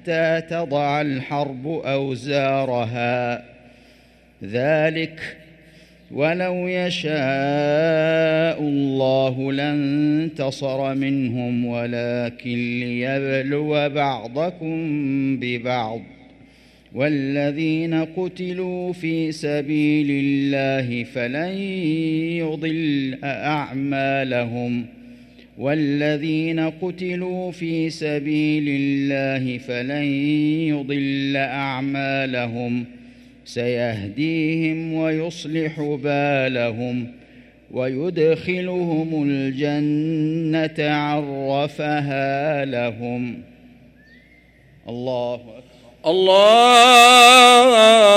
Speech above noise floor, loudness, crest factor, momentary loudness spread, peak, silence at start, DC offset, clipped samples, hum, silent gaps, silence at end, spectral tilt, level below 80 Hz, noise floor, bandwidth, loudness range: 32 dB; -19 LUFS; 20 dB; 8 LU; 0 dBFS; 0.05 s; under 0.1%; under 0.1%; none; none; 0 s; -4.5 dB/octave; -58 dBFS; -52 dBFS; 16 kHz; 5 LU